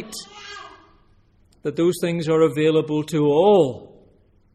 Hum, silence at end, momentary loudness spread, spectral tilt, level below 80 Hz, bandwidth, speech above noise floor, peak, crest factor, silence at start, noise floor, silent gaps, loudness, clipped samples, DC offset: none; 0.7 s; 21 LU; -6.5 dB/octave; -58 dBFS; 14.5 kHz; 38 dB; -4 dBFS; 18 dB; 0 s; -57 dBFS; none; -19 LUFS; under 0.1%; under 0.1%